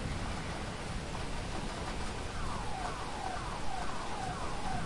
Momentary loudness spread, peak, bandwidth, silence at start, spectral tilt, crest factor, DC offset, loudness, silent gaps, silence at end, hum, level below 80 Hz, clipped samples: 1 LU; -24 dBFS; 11.5 kHz; 0 s; -4.5 dB/octave; 12 dB; under 0.1%; -39 LUFS; none; 0 s; none; -44 dBFS; under 0.1%